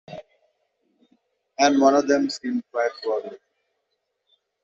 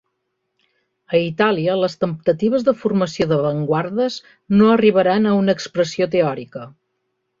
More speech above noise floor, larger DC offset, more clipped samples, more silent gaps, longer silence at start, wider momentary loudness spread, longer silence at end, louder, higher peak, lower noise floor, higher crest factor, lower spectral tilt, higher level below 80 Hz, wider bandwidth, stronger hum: about the same, 55 dB vs 56 dB; neither; neither; neither; second, 0.1 s vs 1.1 s; first, 23 LU vs 8 LU; first, 1.3 s vs 0.7 s; second, -22 LUFS vs -18 LUFS; about the same, -4 dBFS vs -2 dBFS; about the same, -76 dBFS vs -74 dBFS; about the same, 20 dB vs 16 dB; second, -2 dB/octave vs -6.5 dB/octave; second, -70 dBFS vs -56 dBFS; about the same, 7.8 kHz vs 7.6 kHz; neither